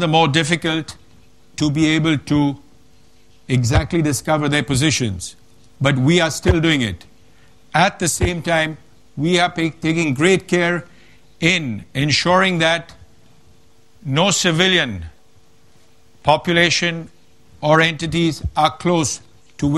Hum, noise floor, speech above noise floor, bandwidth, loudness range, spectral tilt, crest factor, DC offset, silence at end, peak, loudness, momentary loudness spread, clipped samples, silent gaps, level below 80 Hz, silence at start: none; -55 dBFS; 37 dB; 13.5 kHz; 2 LU; -4.5 dB/octave; 18 dB; 0.5%; 0 s; 0 dBFS; -17 LUFS; 10 LU; under 0.1%; none; -38 dBFS; 0 s